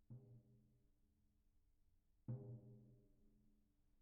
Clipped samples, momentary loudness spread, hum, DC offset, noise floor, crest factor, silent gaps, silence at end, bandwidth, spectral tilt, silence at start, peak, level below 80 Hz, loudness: under 0.1%; 14 LU; none; under 0.1%; -80 dBFS; 22 dB; none; 0 s; 1.6 kHz; -12 dB/octave; 0 s; -40 dBFS; -78 dBFS; -57 LUFS